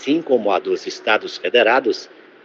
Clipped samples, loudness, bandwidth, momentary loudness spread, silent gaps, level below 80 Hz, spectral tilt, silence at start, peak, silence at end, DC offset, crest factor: under 0.1%; -18 LUFS; 7.6 kHz; 9 LU; none; -80 dBFS; -3.5 dB/octave; 0 s; -2 dBFS; 0.4 s; under 0.1%; 18 dB